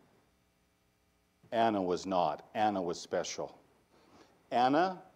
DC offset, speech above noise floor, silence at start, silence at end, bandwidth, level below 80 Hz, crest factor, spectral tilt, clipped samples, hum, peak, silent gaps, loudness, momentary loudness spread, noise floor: under 0.1%; 41 dB; 1.5 s; 0.1 s; 11.5 kHz; -74 dBFS; 20 dB; -4.5 dB/octave; under 0.1%; none; -16 dBFS; none; -33 LUFS; 9 LU; -73 dBFS